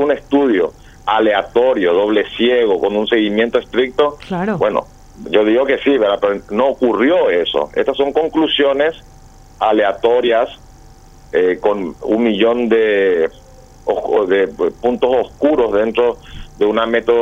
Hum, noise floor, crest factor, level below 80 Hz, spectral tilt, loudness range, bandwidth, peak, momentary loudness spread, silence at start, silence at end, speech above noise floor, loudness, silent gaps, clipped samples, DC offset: none; -41 dBFS; 14 dB; -44 dBFS; -6 dB/octave; 2 LU; 8 kHz; 0 dBFS; 6 LU; 0 s; 0 s; 26 dB; -15 LUFS; none; under 0.1%; under 0.1%